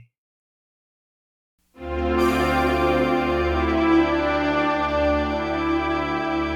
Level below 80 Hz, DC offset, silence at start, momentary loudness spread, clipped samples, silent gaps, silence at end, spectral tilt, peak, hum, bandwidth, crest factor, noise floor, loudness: -36 dBFS; under 0.1%; 1.8 s; 5 LU; under 0.1%; none; 0 s; -6.5 dB/octave; -8 dBFS; none; 16 kHz; 14 dB; under -90 dBFS; -21 LUFS